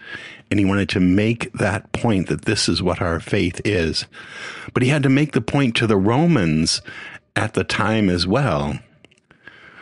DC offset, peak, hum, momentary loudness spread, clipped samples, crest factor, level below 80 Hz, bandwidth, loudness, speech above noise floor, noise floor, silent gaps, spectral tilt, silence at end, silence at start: under 0.1%; 0 dBFS; none; 12 LU; under 0.1%; 20 dB; -44 dBFS; 11.5 kHz; -19 LUFS; 34 dB; -53 dBFS; none; -5.5 dB/octave; 0 s; 0 s